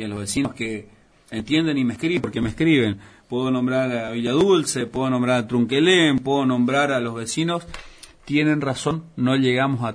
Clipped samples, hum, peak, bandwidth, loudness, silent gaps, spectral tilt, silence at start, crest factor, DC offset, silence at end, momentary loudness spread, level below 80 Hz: under 0.1%; none; -6 dBFS; 11 kHz; -21 LUFS; none; -5 dB/octave; 0 s; 14 dB; under 0.1%; 0 s; 11 LU; -50 dBFS